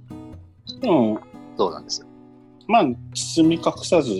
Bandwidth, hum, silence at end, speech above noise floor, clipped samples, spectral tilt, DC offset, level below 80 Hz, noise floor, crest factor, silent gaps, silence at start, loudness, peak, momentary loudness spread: 11.5 kHz; none; 0 s; 28 dB; under 0.1%; -5 dB/octave; under 0.1%; -56 dBFS; -48 dBFS; 18 dB; none; 0.1 s; -21 LUFS; -4 dBFS; 21 LU